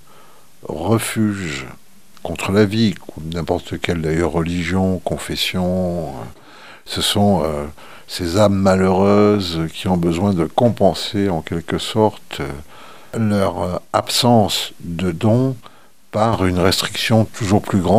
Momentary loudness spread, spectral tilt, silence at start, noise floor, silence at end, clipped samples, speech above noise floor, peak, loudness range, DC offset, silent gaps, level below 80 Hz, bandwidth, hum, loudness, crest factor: 14 LU; -5.5 dB/octave; 0.7 s; -48 dBFS; 0 s; under 0.1%; 31 dB; 0 dBFS; 4 LU; 1%; none; -42 dBFS; 16.5 kHz; none; -18 LUFS; 18 dB